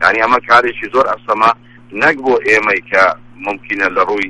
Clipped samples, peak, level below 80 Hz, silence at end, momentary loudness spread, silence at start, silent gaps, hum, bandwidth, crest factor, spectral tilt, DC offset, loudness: 0.1%; 0 dBFS; -48 dBFS; 0 s; 12 LU; 0 s; none; none; 11.5 kHz; 14 dB; -4 dB/octave; under 0.1%; -13 LUFS